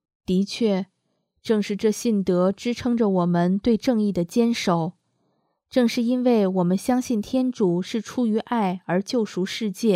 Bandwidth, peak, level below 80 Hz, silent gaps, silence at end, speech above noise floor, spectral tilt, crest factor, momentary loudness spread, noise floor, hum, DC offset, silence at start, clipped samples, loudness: 15 kHz; -6 dBFS; -58 dBFS; none; 0 s; 51 dB; -6.5 dB/octave; 16 dB; 6 LU; -73 dBFS; none; under 0.1%; 0.3 s; under 0.1%; -23 LUFS